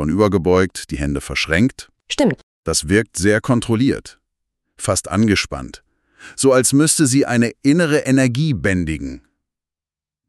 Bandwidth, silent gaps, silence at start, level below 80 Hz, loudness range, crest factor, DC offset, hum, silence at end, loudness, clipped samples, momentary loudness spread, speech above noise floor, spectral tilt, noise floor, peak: 13.5 kHz; 2.43-2.63 s; 0 s; -38 dBFS; 4 LU; 16 dB; under 0.1%; none; 1.1 s; -17 LUFS; under 0.1%; 12 LU; over 73 dB; -4.5 dB/octave; under -90 dBFS; 0 dBFS